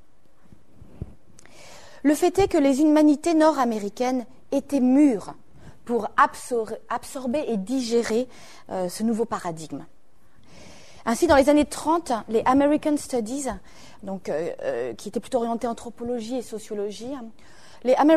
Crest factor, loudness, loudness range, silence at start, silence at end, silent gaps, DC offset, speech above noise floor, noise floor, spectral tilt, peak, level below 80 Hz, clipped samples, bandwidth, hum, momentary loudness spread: 20 dB; -23 LUFS; 8 LU; 1 s; 0 s; none; 0.7%; 37 dB; -60 dBFS; -5 dB/octave; -4 dBFS; -50 dBFS; under 0.1%; 13.5 kHz; none; 17 LU